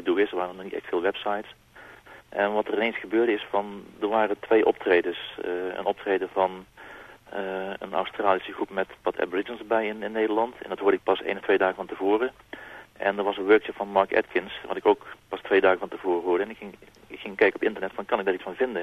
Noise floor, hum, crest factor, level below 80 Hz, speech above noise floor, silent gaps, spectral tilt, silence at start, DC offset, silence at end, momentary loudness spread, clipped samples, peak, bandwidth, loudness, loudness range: -49 dBFS; none; 22 dB; -64 dBFS; 23 dB; none; -6 dB/octave; 0 s; under 0.1%; 0 s; 15 LU; under 0.1%; -4 dBFS; 13 kHz; -26 LUFS; 4 LU